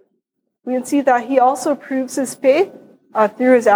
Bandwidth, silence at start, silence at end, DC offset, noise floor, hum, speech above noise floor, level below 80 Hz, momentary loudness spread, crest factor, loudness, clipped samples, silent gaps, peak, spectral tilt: 19 kHz; 0.65 s; 0 s; under 0.1%; -72 dBFS; none; 57 dB; -76 dBFS; 10 LU; 16 dB; -17 LUFS; under 0.1%; none; -2 dBFS; -4 dB/octave